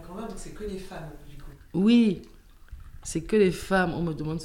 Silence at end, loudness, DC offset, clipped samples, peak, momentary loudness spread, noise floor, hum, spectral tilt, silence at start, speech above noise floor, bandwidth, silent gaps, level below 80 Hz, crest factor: 0 s; -25 LUFS; under 0.1%; under 0.1%; -10 dBFS; 20 LU; -46 dBFS; none; -6 dB/octave; 0 s; 20 dB; 15.5 kHz; none; -44 dBFS; 16 dB